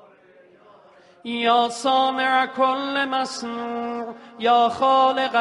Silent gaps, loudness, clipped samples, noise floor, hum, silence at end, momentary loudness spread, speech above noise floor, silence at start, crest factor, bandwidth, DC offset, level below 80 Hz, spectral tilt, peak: none; -21 LUFS; under 0.1%; -52 dBFS; none; 0 s; 12 LU; 31 dB; 1.25 s; 16 dB; 11.5 kHz; under 0.1%; -70 dBFS; -2.5 dB/octave; -6 dBFS